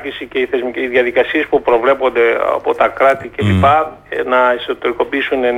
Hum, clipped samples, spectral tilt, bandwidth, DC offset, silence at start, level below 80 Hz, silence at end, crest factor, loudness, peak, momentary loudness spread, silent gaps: none; under 0.1%; -7 dB/octave; 13.5 kHz; under 0.1%; 0 s; -44 dBFS; 0 s; 12 dB; -14 LUFS; -2 dBFS; 6 LU; none